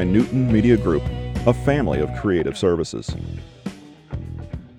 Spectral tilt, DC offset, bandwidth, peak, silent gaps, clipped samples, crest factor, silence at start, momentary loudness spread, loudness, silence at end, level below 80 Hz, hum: -7.5 dB/octave; under 0.1%; 11.5 kHz; -4 dBFS; none; under 0.1%; 18 dB; 0 s; 17 LU; -20 LUFS; 0.1 s; -34 dBFS; none